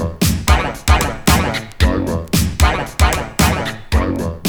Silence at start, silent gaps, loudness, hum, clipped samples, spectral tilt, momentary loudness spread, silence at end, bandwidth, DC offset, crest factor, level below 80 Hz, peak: 0 s; none; -16 LUFS; none; under 0.1%; -4.5 dB/octave; 5 LU; 0 s; over 20 kHz; under 0.1%; 16 dB; -20 dBFS; 0 dBFS